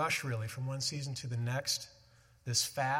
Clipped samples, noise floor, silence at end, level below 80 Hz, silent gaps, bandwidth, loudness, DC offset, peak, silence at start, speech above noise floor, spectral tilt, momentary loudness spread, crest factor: under 0.1%; -63 dBFS; 0 s; -70 dBFS; none; 16.5 kHz; -35 LUFS; under 0.1%; -16 dBFS; 0 s; 28 dB; -3 dB/octave; 7 LU; 20 dB